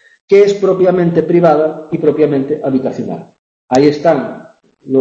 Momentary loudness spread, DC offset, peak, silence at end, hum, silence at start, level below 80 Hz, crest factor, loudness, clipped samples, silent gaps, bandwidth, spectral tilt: 12 LU; under 0.1%; 0 dBFS; 0 s; none; 0.3 s; -54 dBFS; 12 dB; -12 LUFS; under 0.1%; 3.39-3.68 s; 8 kHz; -7.5 dB/octave